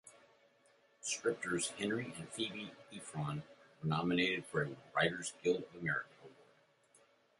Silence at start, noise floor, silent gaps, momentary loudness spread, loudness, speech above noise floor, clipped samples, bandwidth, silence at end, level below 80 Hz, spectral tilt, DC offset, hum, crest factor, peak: 0.05 s; -70 dBFS; none; 12 LU; -38 LUFS; 32 dB; under 0.1%; 11.5 kHz; 1 s; -72 dBFS; -4 dB/octave; under 0.1%; none; 22 dB; -18 dBFS